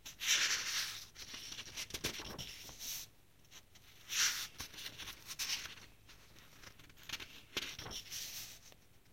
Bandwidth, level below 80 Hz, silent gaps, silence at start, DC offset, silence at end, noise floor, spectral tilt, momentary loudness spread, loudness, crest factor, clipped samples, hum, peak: 16.5 kHz; -66 dBFS; none; 0 s; under 0.1%; 0 s; -65 dBFS; 0.5 dB/octave; 25 LU; -39 LUFS; 24 dB; under 0.1%; none; -20 dBFS